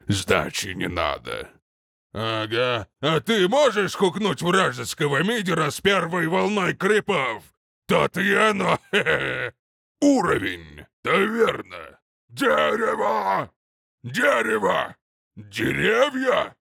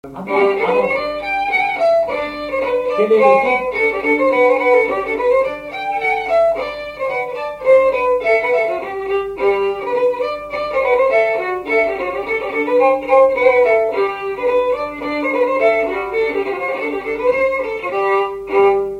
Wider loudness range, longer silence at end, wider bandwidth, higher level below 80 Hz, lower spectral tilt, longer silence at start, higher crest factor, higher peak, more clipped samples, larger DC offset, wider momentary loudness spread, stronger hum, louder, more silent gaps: about the same, 2 LU vs 3 LU; about the same, 0.1 s vs 0 s; first, 18 kHz vs 10 kHz; second, -56 dBFS vs -48 dBFS; about the same, -4.5 dB/octave vs -5.5 dB/octave; about the same, 0.05 s vs 0.05 s; about the same, 18 dB vs 16 dB; second, -6 dBFS vs 0 dBFS; neither; neither; first, 12 LU vs 9 LU; neither; second, -22 LUFS vs -16 LUFS; first, 1.62-2.10 s, 7.57-7.82 s, 9.59-9.95 s, 10.93-11.03 s, 12.02-12.28 s, 13.56-13.98 s, 15.01-15.31 s vs none